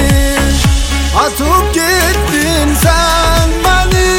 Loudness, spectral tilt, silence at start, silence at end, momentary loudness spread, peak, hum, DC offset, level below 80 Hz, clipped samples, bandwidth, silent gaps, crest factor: -11 LUFS; -4 dB/octave; 0 s; 0 s; 2 LU; 0 dBFS; none; under 0.1%; -14 dBFS; under 0.1%; 17 kHz; none; 10 dB